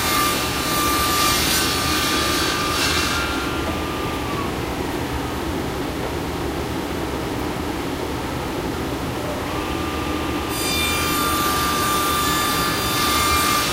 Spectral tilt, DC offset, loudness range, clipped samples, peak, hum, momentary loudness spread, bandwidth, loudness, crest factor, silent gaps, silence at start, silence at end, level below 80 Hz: -3 dB/octave; under 0.1%; 7 LU; under 0.1%; -6 dBFS; none; 8 LU; 16 kHz; -21 LUFS; 16 dB; none; 0 s; 0 s; -34 dBFS